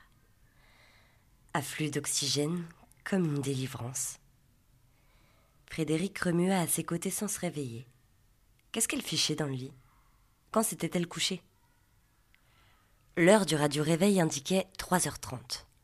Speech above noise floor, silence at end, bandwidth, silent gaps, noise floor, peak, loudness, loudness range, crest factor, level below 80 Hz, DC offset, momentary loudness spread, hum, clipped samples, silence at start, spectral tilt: 37 dB; 0.2 s; 15.5 kHz; none; -67 dBFS; -8 dBFS; -31 LUFS; 7 LU; 24 dB; -64 dBFS; under 0.1%; 14 LU; none; under 0.1%; 1.55 s; -4 dB/octave